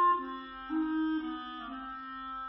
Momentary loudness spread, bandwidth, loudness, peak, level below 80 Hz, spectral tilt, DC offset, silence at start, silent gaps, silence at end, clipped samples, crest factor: 10 LU; 5.6 kHz; -35 LUFS; -20 dBFS; -62 dBFS; -1.5 dB/octave; under 0.1%; 0 s; none; 0 s; under 0.1%; 14 dB